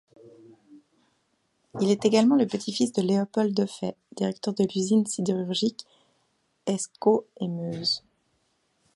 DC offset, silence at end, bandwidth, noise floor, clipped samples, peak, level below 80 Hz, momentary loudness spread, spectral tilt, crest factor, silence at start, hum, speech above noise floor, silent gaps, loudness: under 0.1%; 1 s; 11.5 kHz; -72 dBFS; under 0.1%; -8 dBFS; -72 dBFS; 10 LU; -5.5 dB/octave; 20 dB; 0.25 s; none; 47 dB; none; -26 LUFS